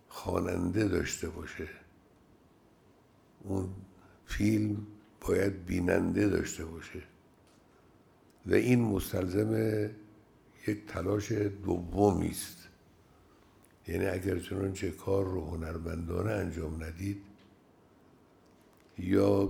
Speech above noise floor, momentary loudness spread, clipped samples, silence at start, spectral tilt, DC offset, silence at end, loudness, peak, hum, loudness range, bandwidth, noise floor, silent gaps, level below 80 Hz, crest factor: 32 dB; 15 LU; under 0.1%; 0.1 s; -6.5 dB/octave; under 0.1%; 0 s; -33 LUFS; -12 dBFS; none; 6 LU; 20 kHz; -63 dBFS; none; -54 dBFS; 22 dB